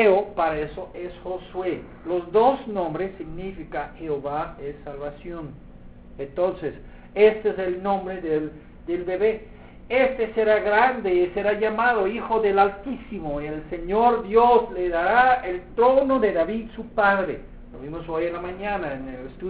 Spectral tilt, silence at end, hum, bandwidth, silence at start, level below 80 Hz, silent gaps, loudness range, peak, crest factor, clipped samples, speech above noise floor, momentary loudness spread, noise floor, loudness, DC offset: -9.5 dB/octave; 0 s; none; 4 kHz; 0 s; -46 dBFS; none; 10 LU; -4 dBFS; 18 dB; under 0.1%; 20 dB; 16 LU; -43 dBFS; -23 LUFS; 0.1%